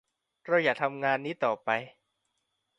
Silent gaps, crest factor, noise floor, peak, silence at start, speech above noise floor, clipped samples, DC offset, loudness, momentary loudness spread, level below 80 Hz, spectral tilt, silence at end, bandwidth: none; 22 dB; -80 dBFS; -10 dBFS; 0.45 s; 51 dB; under 0.1%; under 0.1%; -29 LUFS; 11 LU; -78 dBFS; -6 dB/octave; 0.9 s; 9.4 kHz